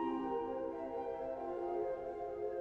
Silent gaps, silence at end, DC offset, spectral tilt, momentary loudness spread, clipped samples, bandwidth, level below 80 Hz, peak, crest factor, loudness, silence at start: none; 0 s; under 0.1%; -8 dB/octave; 3 LU; under 0.1%; 7 kHz; -66 dBFS; -28 dBFS; 12 dB; -41 LUFS; 0 s